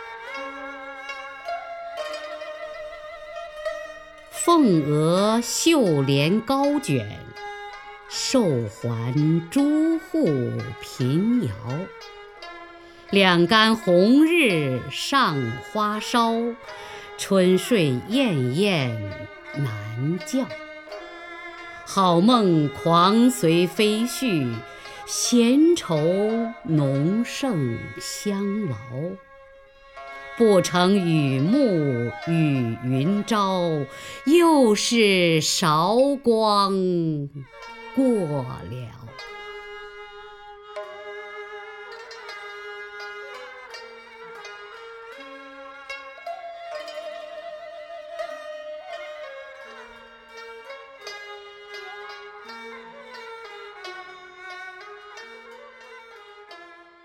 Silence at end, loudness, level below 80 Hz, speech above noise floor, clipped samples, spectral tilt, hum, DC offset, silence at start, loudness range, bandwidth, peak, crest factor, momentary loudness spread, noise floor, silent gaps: 0.3 s; -21 LUFS; -60 dBFS; 28 dB; under 0.1%; -5 dB/octave; none; under 0.1%; 0 s; 19 LU; 17 kHz; -2 dBFS; 22 dB; 22 LU; -49 dBFS; none